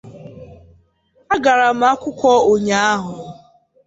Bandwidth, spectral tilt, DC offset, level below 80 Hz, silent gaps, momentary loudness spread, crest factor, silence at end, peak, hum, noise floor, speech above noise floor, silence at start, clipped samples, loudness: 8 kHz; -4 dB/octave; under 0.1%; -52 dBFS; none; 19 LU; 16 dB; 0.55 s; -2 dBFS; none; -58 dBFS; 43 dB; 0.05 s; under 0.1%; -15 LUFS